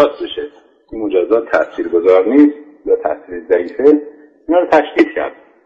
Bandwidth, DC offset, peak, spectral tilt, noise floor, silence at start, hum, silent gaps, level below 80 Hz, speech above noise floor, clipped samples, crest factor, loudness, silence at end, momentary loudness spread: 6.8 kHz; under 0.1%; 0 dBFS; -6 dB/octave; -32 dBFS; 0 s; none; none; -52 dBFS; 19 dB; under 0.1%; 14 dB; -14 LUFS; 0.35 s; 14 LU